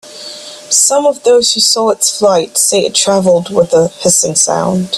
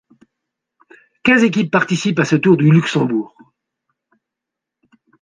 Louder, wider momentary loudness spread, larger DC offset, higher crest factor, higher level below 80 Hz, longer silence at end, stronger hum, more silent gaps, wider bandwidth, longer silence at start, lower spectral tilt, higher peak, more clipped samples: first, -10 LUFS vs -15 LUFS; second, 5 LU vs 8 LU; neither; second, 12 dB vs 18 dB; first, -52 dBFS vs -58 dBFS; second, 0 s vs 1.95 s; neither; neither; first, 15 kHz vs 9.6 kHz; second, 0.05 s vs 1.25 s; second, -2.5 dB/octave vs -6.5 dB/octave; about the same, 0 dBFS vs 0 dBFS; neither